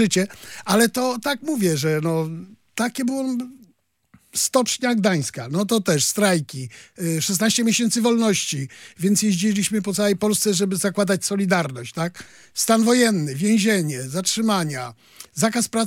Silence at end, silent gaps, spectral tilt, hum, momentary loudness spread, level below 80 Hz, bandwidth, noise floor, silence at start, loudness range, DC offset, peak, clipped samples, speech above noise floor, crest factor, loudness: 0 s; none; -4 dB/octave; none; 11 LU; -66 dBFS; 17 kHz; -57 dBFS; 0 s; 3 LU; under 0.1%; -4 dBFS; under 0.1%; 36 dB; 18 dB; -21 LUFS